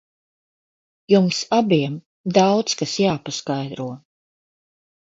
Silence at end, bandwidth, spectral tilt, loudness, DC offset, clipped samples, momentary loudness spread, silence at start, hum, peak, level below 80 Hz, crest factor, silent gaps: 1.1 s; 7.8 kHz; -5 dB/octave; -20 LUFS; under 0.1%; under 0.1%; 13 LU; 1.1 s; none; -2 dBFS; -62 dBFS; 20 dB; 2.06-2.24 s